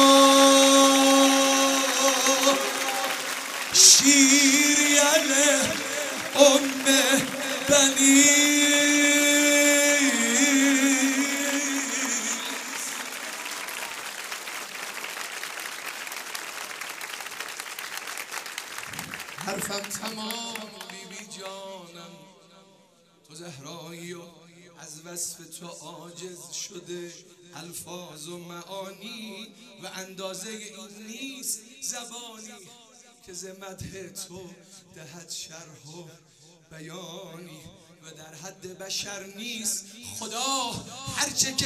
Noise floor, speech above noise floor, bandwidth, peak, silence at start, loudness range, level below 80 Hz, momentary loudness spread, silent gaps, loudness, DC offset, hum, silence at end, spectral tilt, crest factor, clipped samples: -59 dBFS; 24 dB; 16 kHz; 0 dBFS; 0 s; 24 LU; -68 dBFS; 24 LU; none; -21 LUFS; under 0.1%; none; 0 s; -1 dB/octave; 24 dB; under 0.1%